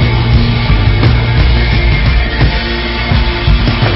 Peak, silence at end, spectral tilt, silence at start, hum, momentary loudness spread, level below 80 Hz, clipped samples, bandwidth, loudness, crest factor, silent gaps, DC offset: 0 dBFS; 0 s; -9.5 dB/octave; 0 s; none; 3 LU; -12 dBFS; under 0.1%; 5.8 kHz; -11 LUFS; 10 dB; none; under 0.1%